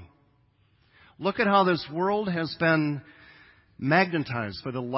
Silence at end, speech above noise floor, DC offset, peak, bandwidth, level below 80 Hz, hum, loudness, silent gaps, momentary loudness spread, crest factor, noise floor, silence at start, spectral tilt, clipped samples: 0 s; 39 dB; under 0.1%; -8 dBFS; 5.8 kHz; -62 dBFS; none; -26 LUFS; none; 11 LU; 20 dB; -65 dBFS; 0 s; -10 dB/octave; under 0.1%